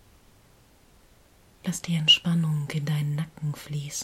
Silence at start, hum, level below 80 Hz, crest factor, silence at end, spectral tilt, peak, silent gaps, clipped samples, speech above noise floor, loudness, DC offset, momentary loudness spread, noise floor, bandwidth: 1.65 s; none; -60 dBFS; 22 dB; 0 s; -4 dB/octave; -6 dBFS; none; under 0.1%; 31 dB; -25 LUFS; under 0.1%; 15 LU; -57 dBFS; 15.5 kHz